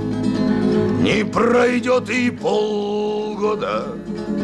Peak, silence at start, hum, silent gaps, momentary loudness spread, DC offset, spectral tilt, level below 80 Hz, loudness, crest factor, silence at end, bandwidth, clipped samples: -8 dBFS; 0 s; none; none; 7 LU; under 0.1%; -6 dB/octave; -46 dBFS; -19 LUFS; 12 dB; 0 s; 11 kHz; under 0.1%